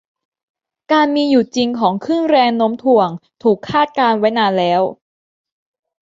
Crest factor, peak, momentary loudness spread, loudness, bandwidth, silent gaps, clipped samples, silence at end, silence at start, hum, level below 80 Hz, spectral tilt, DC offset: 14 dB; -2 dBFS; 5 LU; -15 LUFS; 7.8 kHz; none; under 0.1%; 1.1 s; 0.9 s; none; -58 dBFS; -5.5 dB/octave; under 0.1%